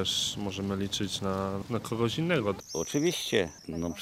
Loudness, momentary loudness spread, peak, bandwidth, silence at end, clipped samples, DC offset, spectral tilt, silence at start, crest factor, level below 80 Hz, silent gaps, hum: -31 LUFS; 6 LU; -10 dBFS; 16 kHz; 0 s; under 0.1%; under 0.1%; -4 dB/octave; 0 s; 20 dB; -56 dBFS; none; none